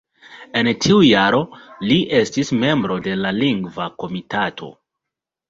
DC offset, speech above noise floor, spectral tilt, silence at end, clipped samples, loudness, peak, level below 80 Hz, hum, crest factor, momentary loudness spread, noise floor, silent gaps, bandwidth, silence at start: under 0.1%; 66 dB; -5 dB/octave; 0.8 s; under 0.1%; -18 LUFS; -2 dBFS; -52 dBFS; none; 18 dB; 14 LU; -84 dBFS; none; 7.8 kHz; 0.3 s